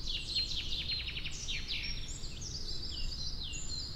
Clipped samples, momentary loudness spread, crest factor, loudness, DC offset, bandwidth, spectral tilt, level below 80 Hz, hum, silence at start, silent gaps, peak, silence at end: under 0.1%; 8 LU; 14 dB; -37 LUFS; under 0.1%; 13 kHz; -1.5 dB/octave; -42 dBFS; none; 0 s; none; -22 dBFS; 0 s